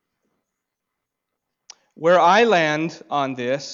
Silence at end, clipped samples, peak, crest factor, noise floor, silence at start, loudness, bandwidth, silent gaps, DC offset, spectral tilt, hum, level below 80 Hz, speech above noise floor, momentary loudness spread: 0 s; under 0.1%; -6 dBFS; 16 dB; -81 dBFS; 2 s; -18 LUFS; 7.6 kHz; none; under 0.1%; -4.5 dB/octave; none; -72 dBFS; 63 dB; 11 LU